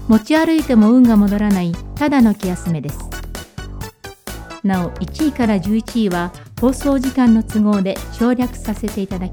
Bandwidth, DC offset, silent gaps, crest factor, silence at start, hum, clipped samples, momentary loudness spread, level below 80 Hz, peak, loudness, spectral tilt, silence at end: 19.5 kHz; under 0.1%; none; 14 dB; 0 s; none; under 0.1%; 18 LU; -34 dBFS; -2 dBFS; -16 LUFS; -6.5 dB/octave; 0 s